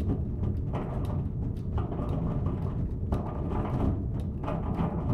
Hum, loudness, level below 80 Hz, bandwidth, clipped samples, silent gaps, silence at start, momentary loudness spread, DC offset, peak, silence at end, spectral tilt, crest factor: none; -32 LUFS; -36 dBFS; 5.6 kHz; under 0.1%; none; 0 s; 3 LU; under 0.1%; -14 dBFS; 0 s; -10.5 dB/octave; 16 dB